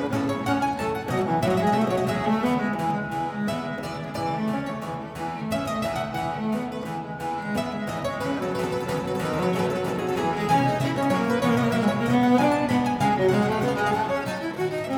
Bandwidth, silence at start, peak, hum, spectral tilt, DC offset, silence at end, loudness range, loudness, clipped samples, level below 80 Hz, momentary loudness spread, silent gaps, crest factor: 18.5 kHz; 0 s; -8 dBFS; none; -6 dB/octave; under 0.1%; 0 s; 7 LU; -25 LUFS; under 0.1%; -52 dBFS; 8 LU; none; 16 dB